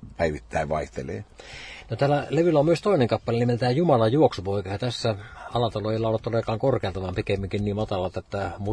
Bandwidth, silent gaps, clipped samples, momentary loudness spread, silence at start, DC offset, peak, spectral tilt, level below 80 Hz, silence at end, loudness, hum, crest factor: 10.5 kHz; none; under 0.1%; 13 LU; 0 s; under 0.1%; -6 dBFS; -7 dB/octave; -46 dBFS; 0 s; -25 LUFS; none; 18 dB